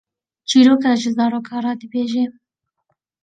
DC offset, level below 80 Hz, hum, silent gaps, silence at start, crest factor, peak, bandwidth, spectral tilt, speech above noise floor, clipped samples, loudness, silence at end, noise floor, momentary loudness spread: under 0.1%; -68 dBFS; none; none; 0.5 s; 16 dB; -2 dBFS; 9.2 kHz; -4 dB/octave; 56 dB; under 0.1%; -17 LUFS; 0.9 s; -72 dBFS; 12 LU